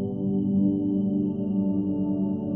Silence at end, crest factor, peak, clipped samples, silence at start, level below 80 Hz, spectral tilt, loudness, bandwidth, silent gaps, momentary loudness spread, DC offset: 0 s; 12 dB; -12 dBFS; under 0.1%; 0 s; -58 dBFS; -13.5 dB/octave; -26 LUFS; 3.2 kHz; none; 3 LU; under 0.1%